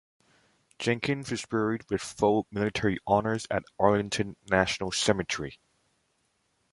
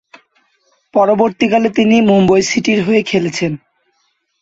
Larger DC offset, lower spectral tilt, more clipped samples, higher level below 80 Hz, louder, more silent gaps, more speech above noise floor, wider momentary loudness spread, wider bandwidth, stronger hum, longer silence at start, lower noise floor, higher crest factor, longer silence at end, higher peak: neither; about the same, -4.5 dB/octave vs -5.5 dB/octave; neither; about the same, -54 dBFS vs -50 dBFS; second, -28 LUFS vs -13 LUFS; neither; second, 45 dB vs 51 dB; about the same, 7 LU vs 9 LU; first, 11.5 kHz vs 8 kHz; neither; second, 0.8 s vs 0.95 s; first, -73 dBFS vs -63 dBFS; first, 22 dB vs 14 dB; first, 1.15 s vs 0.85 s; second, -6 dBFS vs 0 dBFS